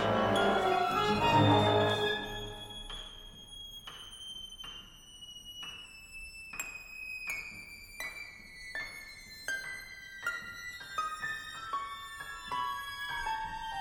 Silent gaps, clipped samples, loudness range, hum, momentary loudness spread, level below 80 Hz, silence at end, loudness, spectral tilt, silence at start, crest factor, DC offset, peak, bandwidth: none; under 0.1%; 14 LU; none; 18 LU; -56 dBFS; 0 s; -34 LUFS; -4.5 dB/octave; 0 s; 20 dB; under 0.1%; -14 dBFS; 17 kHz